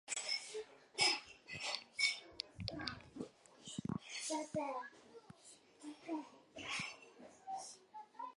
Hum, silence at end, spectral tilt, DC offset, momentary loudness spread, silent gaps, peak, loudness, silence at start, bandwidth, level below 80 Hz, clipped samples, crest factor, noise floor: none; 0.05 s; -2 dB/octave; under 0.1%; 21 LU; none; -20 dBFS; -42 LUFS; 0.05 s; 11.5 kHz; -72 dBFS; under 0.1%; 26 dB; -64 dBFS